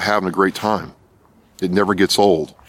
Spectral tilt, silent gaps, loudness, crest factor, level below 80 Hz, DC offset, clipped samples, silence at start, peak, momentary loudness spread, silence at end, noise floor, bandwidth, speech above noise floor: -4.5 dB/octave; none; -18 LUFS; 16 dB; -52 dBFS; under 0.1%; under 0.1%; 0 s; -2 dBFS; 11 LU; 0.2 s; -53 dBFS; 16.5 kHz; 35 dB